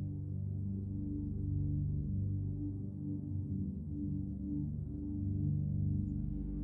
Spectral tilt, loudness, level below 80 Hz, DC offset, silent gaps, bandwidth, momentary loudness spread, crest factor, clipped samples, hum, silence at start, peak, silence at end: -14 dB/octave; -39 LUFS; -48 dBFS; under 0.1%; none; 1.1 kHz; 5 LU; 12 dB; under 0.1%; 50 Hz at -55 dBFS; 0 s; -26 dBFS; 0 s